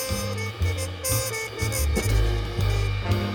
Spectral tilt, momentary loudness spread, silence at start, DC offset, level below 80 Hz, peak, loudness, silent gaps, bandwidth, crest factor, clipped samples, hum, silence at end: -4.5 dB/octave; 4 LU; 0 s; under 0.1%; -30 dBFS; -10 dBFS; -26 LUFS; none; 19 kHz; 14 dB; under 0.1%; none; 0 s